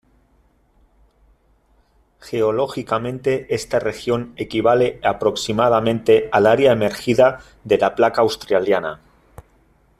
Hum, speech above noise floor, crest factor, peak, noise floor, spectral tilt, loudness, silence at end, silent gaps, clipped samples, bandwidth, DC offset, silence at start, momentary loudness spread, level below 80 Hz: none; 41 dB; 18 dB; -2 dBFS; -59 dBFS; -5.5 dB/octave; -18 LUFS; 1.05 s; none; under 0.1%; 14 kHz; under 0.1%; 2.25 s; 8 LU; -50 dBFS